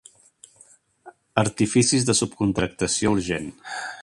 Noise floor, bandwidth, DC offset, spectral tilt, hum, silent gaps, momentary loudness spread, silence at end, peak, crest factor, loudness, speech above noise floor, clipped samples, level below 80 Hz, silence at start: -55 dBFS; 11.5 kHz; under 0.1%; -4 dB/octave; none; none; 12 LU; 0 s; -2 dBFS; 24 dB; -22 LUFS; 33 dB; under 0.1%; -48 dBFS; 1.05 s